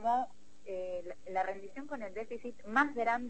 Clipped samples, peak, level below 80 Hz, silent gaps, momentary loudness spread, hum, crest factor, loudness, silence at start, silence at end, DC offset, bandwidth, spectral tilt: under 0.1%; -14 dBFS; -68 dBFS; none; 13 LU; none; 22 dB; -37 LUFS; 0 s; 0 s; 0.5%; 8.4 kHz; -5 dB/octave